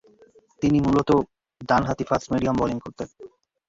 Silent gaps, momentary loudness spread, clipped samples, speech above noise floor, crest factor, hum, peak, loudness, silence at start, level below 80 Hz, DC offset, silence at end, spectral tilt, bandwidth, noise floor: none; 17 LU; under 0.1%; 33 dB; 18 dB; none; -6 dBFS; -23 LUFS; 0.6 s; -46 dBFS; under 0.1%; 0.4 s; -7 dB/octave; 7.8 kHz; -55 dBFS